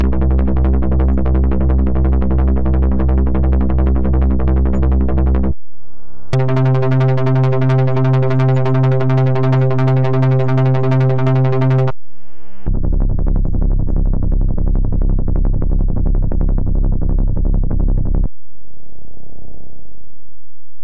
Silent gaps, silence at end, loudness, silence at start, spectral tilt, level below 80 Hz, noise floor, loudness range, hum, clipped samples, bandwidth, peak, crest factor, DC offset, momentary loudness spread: none; 0 s; -16 LUFS; 0 s; -10 dB/octave; -16 dBFS; -56 dBFS; 6 LU; none; under 0.1%; 5 kHz; -6 dBFS; 8 dB; 10%; 5 LU